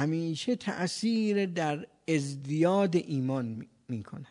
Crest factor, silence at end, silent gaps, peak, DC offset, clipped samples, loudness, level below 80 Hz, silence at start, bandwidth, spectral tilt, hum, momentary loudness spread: 16 dB; 0.05 s; none; -14 dBFS; under 0.1%; under 0.1%; -30 LUFS; -76 dBFS; 0 s; 11 kHz; -6 dB/octave; none; 12 LU